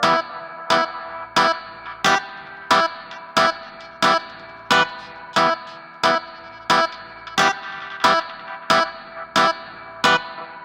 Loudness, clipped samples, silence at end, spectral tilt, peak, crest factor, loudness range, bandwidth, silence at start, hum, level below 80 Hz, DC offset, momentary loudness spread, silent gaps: -20 LUFS; under 0.1%; 0 s; -2.5 dB/octave; -2 dBFS; 18 dB; 1 LU; 16 kHz; 0 s; none; -60 dBFS; under 0.1%; 17 LU; none